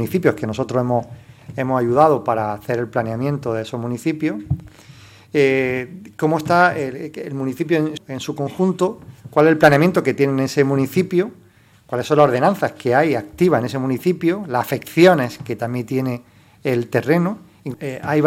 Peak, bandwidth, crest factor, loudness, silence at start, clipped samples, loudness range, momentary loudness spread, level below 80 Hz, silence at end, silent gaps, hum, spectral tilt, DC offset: 0 dBFS; 17 kHz; 18 dB; -19 LUFS; 0 s; under 0.1%; 5 LU; 13 LU; -54 dBFS; 0 s; none; none; -7 dB/octave; under 0.1%